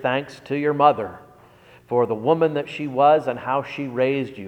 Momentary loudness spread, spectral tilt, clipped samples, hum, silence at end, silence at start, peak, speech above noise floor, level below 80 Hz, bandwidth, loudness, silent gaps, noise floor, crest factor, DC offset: 10 LU; -7.5 dB/octave; under 0.1%; none; 0 s; 0 s; -2 dBFS; 29 dB; -64 dBFS; 9.4 kHz; -21 LUFS; none; -50 dBFS; 20 dB; under 0.1%